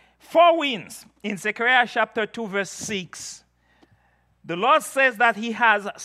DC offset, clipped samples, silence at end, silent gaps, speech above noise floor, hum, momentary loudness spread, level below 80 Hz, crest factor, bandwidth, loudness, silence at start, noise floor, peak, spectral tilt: under 0.1%; under 0.1%; 0 s; none; 41 dB; none; 16 LU; -70 dBFS; 20 dB; 14.5 kHz; -21 LUFS; 0.3 s; -63 dBFS; -4 dBFS; -3 dB/octave